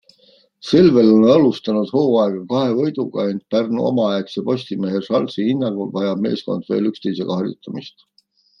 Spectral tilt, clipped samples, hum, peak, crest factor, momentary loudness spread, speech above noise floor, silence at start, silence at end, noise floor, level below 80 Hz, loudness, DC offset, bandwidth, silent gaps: -8 dB/octave; under 0.1%; none; -2 dBFS; 16 dB; 12 LU; 41 dB; 0.65 s; 0.7 s; -59 dBFS; -60 dBFS; -18 LUFS; under 0.1%; 7 kHz; none